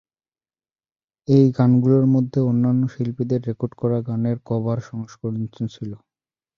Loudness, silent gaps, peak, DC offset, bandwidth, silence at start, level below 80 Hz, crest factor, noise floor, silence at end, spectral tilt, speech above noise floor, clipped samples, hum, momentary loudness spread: -21 LUFS; none; -4 dBFS; under 0.1%; 6.8 kHz; 1.3 s; -58 dBFS; 18 dB; under -90 dBFS; 0.6 s; -10 dB/octave; over 70 dB; under 0.1%; none; 14 LU